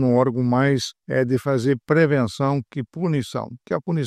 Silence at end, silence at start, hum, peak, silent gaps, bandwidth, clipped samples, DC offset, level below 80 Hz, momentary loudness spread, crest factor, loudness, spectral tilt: 0 s; 0 s; none; -6 dBFS; none; 13.5 kHz; under 0.1%; under 0.1%; -60 dBFS; 9 LU; 16 dB; -22 LUFS; -7 dB/octave